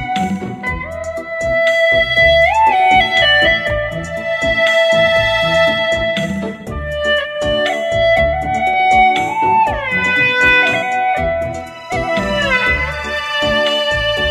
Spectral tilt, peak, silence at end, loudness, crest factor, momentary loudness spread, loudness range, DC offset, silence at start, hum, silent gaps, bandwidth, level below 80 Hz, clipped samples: -4 dB/octave; 0 dBFS; 0 s; -13 LUFS; 14 dB; 11 LU; 4 LU; under 0.1%; 0 s; none; none; 14.5 kHz; -32 dBFS; under 0.1%